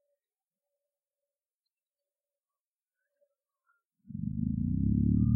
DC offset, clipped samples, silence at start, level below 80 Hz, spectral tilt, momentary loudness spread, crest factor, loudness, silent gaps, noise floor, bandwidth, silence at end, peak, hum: under 0.1%; under 0.1%; 4.1 s; -46 dBFS; -15 dB/octave; 12 LU; 20 dB; -31 LUFS; none; under -90 dBFS; 1.5 kHz; 0 s; -16 dBFS; none